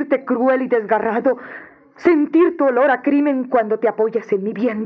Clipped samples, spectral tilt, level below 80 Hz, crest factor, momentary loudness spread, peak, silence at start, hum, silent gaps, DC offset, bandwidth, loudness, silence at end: under 0.1%; -8 dB/octave; -66 dBFS; 16 dB; 6 LU; -2 dBFS; 0 s; none; none; under 0.1%; 6.2 kHz; -17 LUFS; 0 s